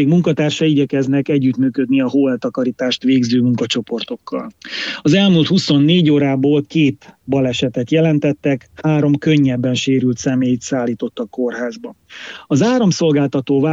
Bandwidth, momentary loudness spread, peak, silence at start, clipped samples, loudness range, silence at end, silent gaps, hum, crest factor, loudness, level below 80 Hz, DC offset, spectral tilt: 7.8 kHz; 11 LU; -2 dBFS; 0 s; under 0.1%; 3 LU; 0 s; none; none; 14 dB; -16 LUFS; -56 dBFS; under 0.1%; -6 dB/octave